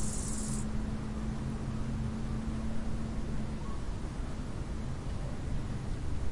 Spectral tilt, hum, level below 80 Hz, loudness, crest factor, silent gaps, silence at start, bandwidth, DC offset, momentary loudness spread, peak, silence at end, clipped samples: -6 dB/octave; none; -40 dBFS; -38 LUFS; 12 dB; none; 0 s; 11.5 kHz; under 0.1%; 4 LU; -22 dBFS; 0 s; under 0.1%